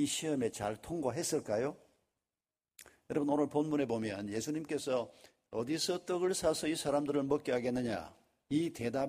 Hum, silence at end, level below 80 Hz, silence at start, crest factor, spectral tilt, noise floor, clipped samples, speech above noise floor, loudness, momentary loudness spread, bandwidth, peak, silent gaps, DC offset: none; 0 s; -66 dBFS; 0 s; 18 dB; -4.5 dB/octave; under -90 dBFS; under 0.1%; over 55 dB; -35 LUFS; 7 LU; 15.5 kHz; -18 dBFS; none; under 0.1%